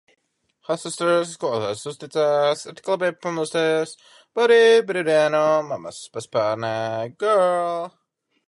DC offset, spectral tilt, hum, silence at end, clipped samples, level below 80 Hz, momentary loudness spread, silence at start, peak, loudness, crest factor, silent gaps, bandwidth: under 0.1%; -4 dB/octave; none; 0.6 s; under 0.1%; -72 dBFS; 14 LU; 0.7 s; -6 dBFS; -21 LUFS; 16 dB; none; 11.5 kHz